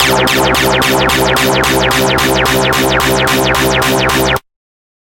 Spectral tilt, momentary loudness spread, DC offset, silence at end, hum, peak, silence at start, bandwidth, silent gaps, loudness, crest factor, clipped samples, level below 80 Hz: -3.5 dB/octave; 1 LU; under 0.1%; 0.8 s; none; 0 dBFS; 0 s; 17.5 kHz; none; -10 LUFS; 12 dB; under 0.1%; -28 dBFS